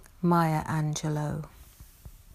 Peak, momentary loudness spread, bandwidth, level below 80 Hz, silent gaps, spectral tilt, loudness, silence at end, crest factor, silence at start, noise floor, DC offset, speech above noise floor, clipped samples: -12 dBFS; 12 LU; 15.5 kHz; -52 dBFS; none; -6.5 dB/octave; -28 LUFS; 0.15 s; 18 dB; 0 s; -50 dBFS; under 0.1%; 23 dB; under 0.1%